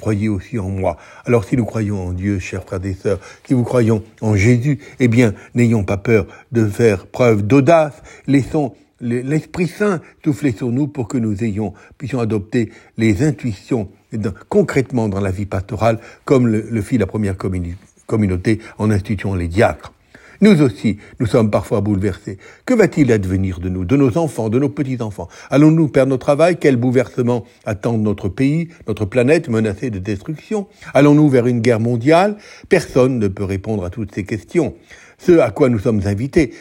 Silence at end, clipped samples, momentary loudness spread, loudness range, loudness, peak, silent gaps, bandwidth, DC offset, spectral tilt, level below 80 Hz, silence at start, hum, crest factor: 0 s; under 0.1%; 11 LU; 5 LU; -17 LUFS; 0 dBFS; none; 16.5 kHz; under 0.1%; -7.5 dB/octave; -46 dBFS; 0 s; none; 16 dB